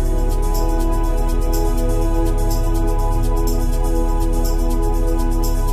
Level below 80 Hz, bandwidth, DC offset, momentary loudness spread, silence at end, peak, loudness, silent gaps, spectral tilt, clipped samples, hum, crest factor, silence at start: -16 dBFS; 15 kHz; under 0.1%; 1 LU; 0 s; -6 dBFS; -21 LUFS; none; -6.5 dB/octave; under 0.1%; none; 8 dB; 0 s